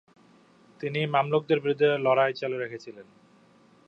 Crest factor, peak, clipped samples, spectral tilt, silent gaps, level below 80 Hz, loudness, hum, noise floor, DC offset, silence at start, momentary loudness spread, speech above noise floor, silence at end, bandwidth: 20 dB; -8 dBFS; under 0.1%; -7 dB/octave; none; -78 dBFS; -26 LUFS; none; -59 dBFS; under 0.1%; 0.8 s; 14 LU; 33 dB; 0.85 s; 7.2 kHz